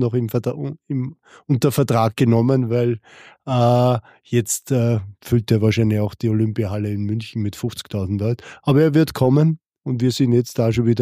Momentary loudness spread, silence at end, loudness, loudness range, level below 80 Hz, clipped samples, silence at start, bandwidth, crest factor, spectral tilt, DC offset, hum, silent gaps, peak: 10 LU; 0 s; -20 LUFS; 2 LU; -50 dBFS; under 0.1%; 0 s; 15.5 kHz; 14 dB; -7 dB/octave; under 0.1%; none; 9.66-9.70 s; -4 dBFS